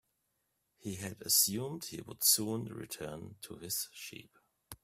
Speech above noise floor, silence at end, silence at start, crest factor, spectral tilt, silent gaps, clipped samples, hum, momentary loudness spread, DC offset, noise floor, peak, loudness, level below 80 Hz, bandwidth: 45 dB; 0.1 s; 0.85 s; 24 dB; -2 dB/octave; none; under 0.1%; none; 20 LU; under 0.1%; -81 dBFS; -14 dBFS; -32 LUFS; -72 dBFS; 16 kHz